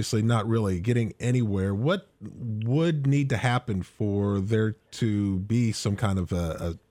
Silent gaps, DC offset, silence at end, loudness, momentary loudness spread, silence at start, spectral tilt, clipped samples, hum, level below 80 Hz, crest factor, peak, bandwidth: none; under 0.1%; 0.15 s; -26 LUFS; 7 LU; 0 s; -6.5 dB/octave; under 0.1%; none; -50 dBFS; 14 dB; -10 dBFS; 13.5 kHz